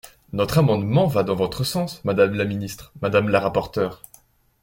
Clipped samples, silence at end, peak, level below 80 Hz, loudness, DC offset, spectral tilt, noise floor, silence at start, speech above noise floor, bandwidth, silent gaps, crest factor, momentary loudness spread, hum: under 0.1%; 0.7 s; -4 dBFS; -50 dBFS; -22 LUFS; under 0.1%; -6.5 dB/octave; -55 dBFS; 0.05 s; 34 dB; 17 kHz; none; 18 dB; 9 LU; none